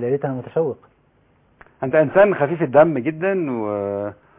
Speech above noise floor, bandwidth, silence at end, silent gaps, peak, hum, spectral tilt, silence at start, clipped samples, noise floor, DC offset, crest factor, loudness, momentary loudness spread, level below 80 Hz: 40 dB; 3.8 kHz; 0.25 s; none; -2 dBFS; none; -11.5 dB/octave; 0 s; under 0.1%; -58 dBFS; under 0.1%; 18 dB; -19 LUFS; 11 LU; -58 dBFS